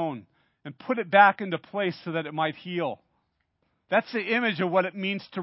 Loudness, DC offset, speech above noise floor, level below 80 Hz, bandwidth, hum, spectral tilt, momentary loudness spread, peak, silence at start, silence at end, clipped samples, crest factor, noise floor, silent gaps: -26 LUFS; under 0.1%; 48 dB; -78 dBFS; 5.8 kHz; none; -9.5 dB/octave; 20 LU; -4 dBFS; 0 s; 0 s; under 0.1%; 24 dB; -74 dBFS; none